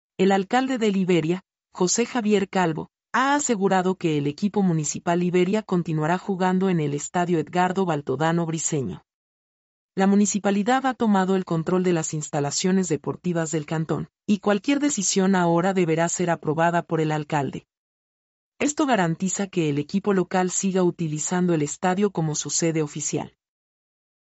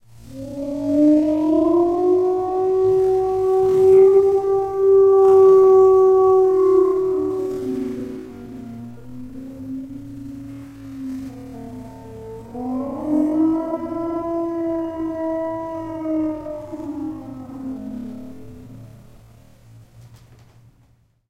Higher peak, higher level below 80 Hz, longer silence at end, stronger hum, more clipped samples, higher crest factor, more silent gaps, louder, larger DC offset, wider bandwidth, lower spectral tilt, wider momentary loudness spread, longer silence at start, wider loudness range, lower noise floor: second, -8 dBFS vs -4 dBFS; second, -66 dBFS vs -50 dBFS; second, 0.95 s vs 1.25 s; neither; neither; about the same, 14 dB vs 14 dB; first, 9.14-9.89 s, 17.77-18.52 s vs none; second, -23 LUFS vs -17 LUFS; second, under 0.1% vs 0.1%; first, 8.2 kHz vs 6.6 kHz; second, -5 dB/octave vs -8.5 dB/octave; second, 6 LU vs 23 LU; about the same, 0.2 s vs 0.25 s; second, 3 LU vs 20 LU; first, under -90 dBFS vs -57 dBFS